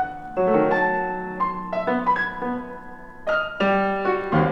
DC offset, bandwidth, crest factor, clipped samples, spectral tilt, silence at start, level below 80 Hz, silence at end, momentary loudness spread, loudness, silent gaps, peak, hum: under 0.1%; 7.6 kHz; 16 dB; under 0.1%; -8 dB/octave; 0 s; -48 dBFS; 0 s; 12 LU; -23 LUFS; none; -6 dBFS; none